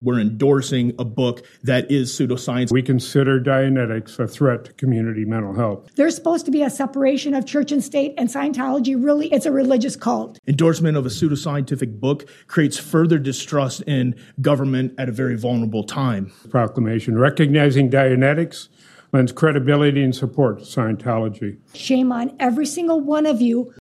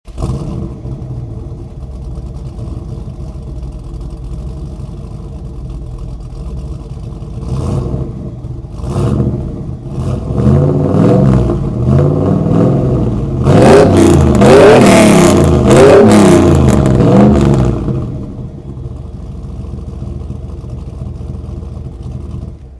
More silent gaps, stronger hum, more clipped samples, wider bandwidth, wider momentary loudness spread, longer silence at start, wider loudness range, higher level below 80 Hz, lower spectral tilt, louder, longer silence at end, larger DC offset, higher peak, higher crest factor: first, 10.39-10.43 s vs none; neither; second, under 0.1% vs 1%; first, 14 kHz vs 11 kHz; second, 7 LU vs 21 LU; about the same, 0 s vs 0.05 s; second, 3 LU vs 20 LU; second, -60 dBFS vs -24 dBFS; about the same, -6.5 dB/octave vs -7 dB/octave; second, -19 LUFS vs -9 LUFS; about the same, 0.1 s vs 0 s; neither; about the same, -2 dBFS vs 0 dBFS; first, 16 dB vs 10 dB